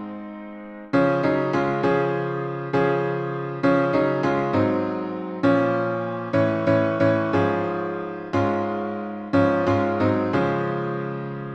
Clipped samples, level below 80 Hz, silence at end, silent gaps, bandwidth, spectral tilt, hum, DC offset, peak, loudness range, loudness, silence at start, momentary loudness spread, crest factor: under 0.1%; -58 dBFS; 0 s; none; 8 kHz; -8.5 dB/octave; none; under 0.1%; -6 dBFS; 1 LU; -23 LUFS; 0 s; 9 LU; 16 dB